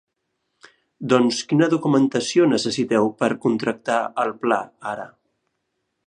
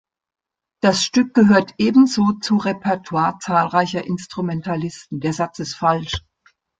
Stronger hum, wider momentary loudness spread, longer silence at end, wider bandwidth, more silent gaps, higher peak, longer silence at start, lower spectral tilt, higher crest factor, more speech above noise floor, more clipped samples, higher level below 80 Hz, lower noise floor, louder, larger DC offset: neither; about the same, 12 LU vs 11 LU; first, 1 s vs 0.6 s; first, 10.5 kHz vs 9.2 kHz; neither; about the same, -2 dBFS vs -2 dBFS; first, 1 s vs 0.85 s; about the same, -5 dB/octave vs -5 dB/octave; about the same, 20 dB vs 16 dB; first, 55 dB vs 41 dB; neither; second, -66 dBFS vs -52 dBFS; first, -75 dBFS vs -59 dBFS; about the same, -21 LUFS vs -19 LUFS; neither